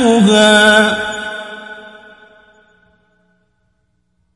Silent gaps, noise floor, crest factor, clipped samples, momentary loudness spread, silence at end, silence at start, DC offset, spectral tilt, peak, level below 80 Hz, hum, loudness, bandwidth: none; -64 dBFS; 16 dB; under 0.1%; 24 LU; 2.45 s; 0 s; under 0.1%; -3.5 dB/octave; 0 dBFS; -50 dBFS; none; -10 LUFS; 11.5 kHz